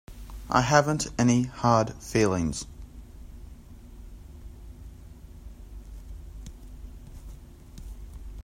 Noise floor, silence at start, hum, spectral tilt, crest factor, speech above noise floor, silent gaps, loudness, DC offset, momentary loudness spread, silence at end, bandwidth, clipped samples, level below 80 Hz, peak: -46 dBFS; 0.1 s; none; -5.5 dB/octave; 24 dB; 22 dB; none; -25 LUFS; under 0.1%; 25 LU; 0 s; 16 kHz; under 0.1%; -44 dBFS; -6 dBFS